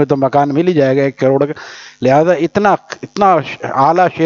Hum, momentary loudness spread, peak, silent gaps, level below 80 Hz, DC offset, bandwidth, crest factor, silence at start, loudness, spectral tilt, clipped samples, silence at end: none; 8 LU; 0 dBFS; none; -54 dBFS; under 0.1%; 7.4 kHz; 12 dB; 0 s; -13 LUFS; -7 dB/octave; under 0.1%; 0 s